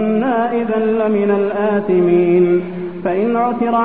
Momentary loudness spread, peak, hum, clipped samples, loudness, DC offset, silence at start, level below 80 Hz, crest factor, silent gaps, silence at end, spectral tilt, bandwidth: 6 LU; -4 dBFS; none; under 0.1%; -16 LUFS; 0.8%; 0 s; -52 dBFS; 12 dB; none; 0 s; -12 dB/octave; 4 kHz